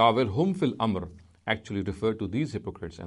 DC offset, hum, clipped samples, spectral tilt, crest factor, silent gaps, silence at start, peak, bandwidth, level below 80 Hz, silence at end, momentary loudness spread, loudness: under 0.1%; none; under 0.1%; -7 dB/octave; 20 dB; none; 0 s; -8 dBFS; 11 kHz; -54 dBFS; 0 s; 11 LU; -29 LUFS